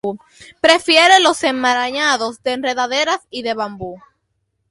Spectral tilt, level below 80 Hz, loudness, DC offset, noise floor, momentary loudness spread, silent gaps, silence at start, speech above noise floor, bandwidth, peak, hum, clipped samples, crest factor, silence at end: -1.5 dB/octave; -58 dBFS; -15 LUFS; under 0.1%; -70 dBFS; 16 LU; none; 0.05 s; 53 dB; 11.5 kHz; 0 dBFS; none; under 0.1%; 16 dB; 0.7 s